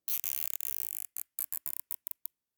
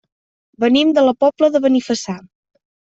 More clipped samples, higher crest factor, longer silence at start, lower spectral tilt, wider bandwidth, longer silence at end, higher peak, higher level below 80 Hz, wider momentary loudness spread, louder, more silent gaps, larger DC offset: neither; first, 26 dB vs 14 dB; second, 0.1 s vs 0.6 s; second, 3.5 dB/octave vs -4.5 dB/octave; first, over 20 kHz vs 8 kHz; about the same, 0.65 s vs 0.75 s; second, -10 dBFS vs -2 dBFS; second, under -90 dBFS vs -62 dBFS; about the same, 8 LU vs 10 LU; second, -35 LUFS vs -15 LUFS; neither; neither